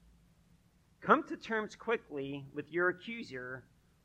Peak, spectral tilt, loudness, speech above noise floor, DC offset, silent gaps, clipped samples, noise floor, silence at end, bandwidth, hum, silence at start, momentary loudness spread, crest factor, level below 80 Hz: -12 dBFS; -6 dB/octave; -35 LUFS; 32 dB; under 0.1%; none; under 0.1%; -67 dBFS; 0.45 s; 9 kHz; none; 1 s; 14 LU; 26 dB; -70 dBFS